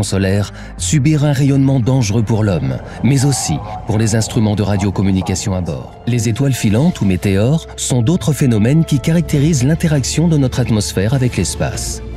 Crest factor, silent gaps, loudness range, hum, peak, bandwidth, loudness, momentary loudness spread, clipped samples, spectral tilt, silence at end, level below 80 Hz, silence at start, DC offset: 12 dB; none; 2 LU; none; -2 dBFS; 15 kHz; -15 LUFS; 6 LU; under 0.1%; -6 dB/octave; 0 s; -32 dBFS; 0 s; under 0.1%